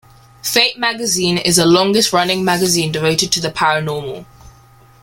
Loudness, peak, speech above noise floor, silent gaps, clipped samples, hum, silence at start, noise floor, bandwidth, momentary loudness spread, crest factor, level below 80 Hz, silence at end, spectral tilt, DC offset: -14 LUFS; 0 dBFS; 31 dB; none; under 0.1%; none; 0.45 s; -46 dBFS; 17 kHz; 11 LU; 16 dB; -48 dBFS; 0.55 s; -3 dB/octave; under 0.1%